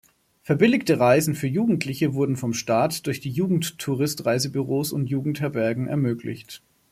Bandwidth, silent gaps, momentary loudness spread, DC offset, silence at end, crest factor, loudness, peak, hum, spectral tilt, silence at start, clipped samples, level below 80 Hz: 15.5 kHz; none; 9 LU; under 0.1%; 0.35 s; 20 dB; -23 LUFS; -4 dBFS; none; -5.5 dB/octave; 0.45 s; under 0.1%; -62 dBFS